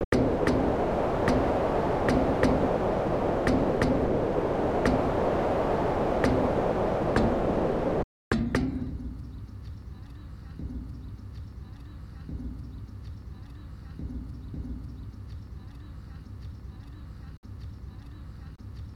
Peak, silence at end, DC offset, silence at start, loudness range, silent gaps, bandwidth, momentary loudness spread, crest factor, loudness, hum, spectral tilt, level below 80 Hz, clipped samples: -8 dBFS; 0 s; under 0.1%; 0 s; 16 LU; 0.04-0.12 s, 8.04-8.31 s, 17.37-17.43 s; 13.5 kHz; 19 LU; 20 dB; -27 LUFS; none; -7.5 dB/octave; -40 dBFS; under 0.1%